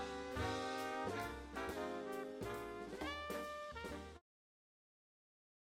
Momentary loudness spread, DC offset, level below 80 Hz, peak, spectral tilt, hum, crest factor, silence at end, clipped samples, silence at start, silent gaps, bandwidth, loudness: 6 LU; under 0.1%; -62 dBFS; -30 dBFS; -4.5 dB/octave; none; 18 dB; 1.45 s; under 0.1%; 0 s; none; 16 kHz; -45 LUFS